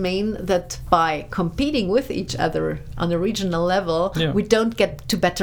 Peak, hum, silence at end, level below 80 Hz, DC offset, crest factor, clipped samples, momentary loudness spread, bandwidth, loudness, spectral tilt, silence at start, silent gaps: 0 dBFS; none; 0 s; -38 dBFS; under 0.1%; 20 dB; under 0.1%; 6 LU; over 20 kHz; -22 LUFS; -5.5 dB/octave; 0 s; none